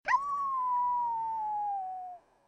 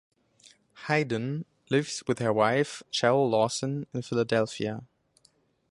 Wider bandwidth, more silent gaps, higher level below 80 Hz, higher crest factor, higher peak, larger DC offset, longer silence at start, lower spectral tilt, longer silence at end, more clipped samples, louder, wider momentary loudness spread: second, 8.6 kHz vs 11.5 kHz; neither; about the same, -70 dBFS vs -68 dBFS; about the same, 16 dB vs 20 dB; second, -18 dBFS vs -8 dBFS; neither; second, 0.05 s vs 0.75 s; second, -2 dB/octave vs -5 dB/octave; second, 0.3 s vs 0.85 s; neither; second, -32 LUFS vs -28 LUFS; about the same, 11 LU vs 10 LU